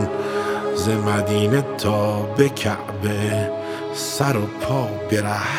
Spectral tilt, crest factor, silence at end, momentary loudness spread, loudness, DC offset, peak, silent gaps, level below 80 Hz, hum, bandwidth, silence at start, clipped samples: -5.5 dB/octave; 18 dB; 0 s; 6 LU; -21 LUFS; under 0.1%; -2 dBFS; none; -52 dBFS; none; 16.5 kHz; 0 s; under 0.1%